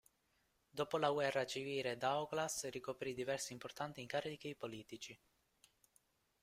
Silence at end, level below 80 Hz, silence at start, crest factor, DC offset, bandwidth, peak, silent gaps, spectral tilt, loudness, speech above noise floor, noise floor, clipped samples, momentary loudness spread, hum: 1.25 s; -78 dBFS; 0.75 s; 22 dB; under 0.1%; 16 kHz; -22 dBFS; none; -3.5 dB/octave; -42 LUFS; 38 dB; -80 dBFS; under 0.1%; 12 LU; none